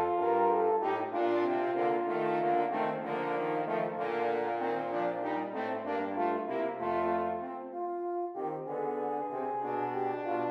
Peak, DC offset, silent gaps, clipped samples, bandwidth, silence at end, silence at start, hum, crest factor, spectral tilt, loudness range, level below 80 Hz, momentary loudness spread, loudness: -18 dBFS; under 0.1%; none; under 0.1%; 6 kHz; 0 s; 0 s; none; 14 dB; -8 dB/octave; 4 LU; -76 dBFS; 7 LU; -32 LUFS